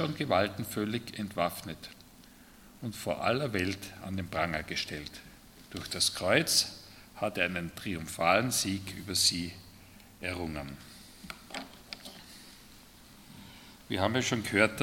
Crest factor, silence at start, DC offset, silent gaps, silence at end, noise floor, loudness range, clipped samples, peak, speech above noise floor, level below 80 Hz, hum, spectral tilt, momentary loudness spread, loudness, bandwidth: 26 dB; 0 s; under 0.1%; none; 0 s; -55 dBFS; 13 LU; under 0.1%; -8 dBFS; 24 dB; -60 dBFS; none; -3 dB/octave; 23 LU; -31 LUFS; 17.5 kHz